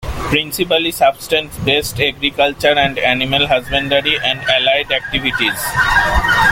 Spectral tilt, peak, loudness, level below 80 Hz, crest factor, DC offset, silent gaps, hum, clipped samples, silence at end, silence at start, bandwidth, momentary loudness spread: -3.5 dB/octave; 0 dBFS; -14 LUFS; -30 dBFS; 14 dB; under 0.1%; none; none; under 0.1%; 0 s; 0 s; 17 kHz; 4 LU